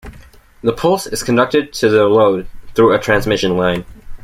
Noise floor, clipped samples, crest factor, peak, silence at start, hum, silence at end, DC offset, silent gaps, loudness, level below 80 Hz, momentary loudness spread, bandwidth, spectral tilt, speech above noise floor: -41 dBFS; under 0.1%; 14 dB; -2 dBFS; 0.05 s; none; 0.05 s; under 0.1%; none; -15 LUFS; -38 dBFS; 9 LU; 16 kHz; -5 dB/octave; 28 dB